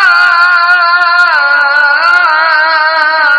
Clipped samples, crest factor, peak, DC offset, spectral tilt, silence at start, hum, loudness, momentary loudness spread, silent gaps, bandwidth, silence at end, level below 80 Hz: 0.9%; 8 dB; 0 dBFS; under 0.1%; 0.5 dB/octave; 0 s; none; -6 LUFS; 2 LU; none; 11 kHz; 0 s; -58 dBFS